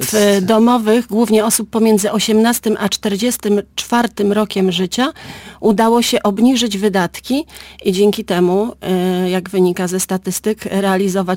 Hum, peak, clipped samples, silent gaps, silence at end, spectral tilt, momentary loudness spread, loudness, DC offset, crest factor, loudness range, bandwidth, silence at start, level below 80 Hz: none; -4 dBFS; under 0.1%; none; 0 s; -4.5 dB/octave; 6 LU; -15 LUFS; under 0.1%; 12 dB; 3 LU; 17 kHz; 0 s; -48 dBFS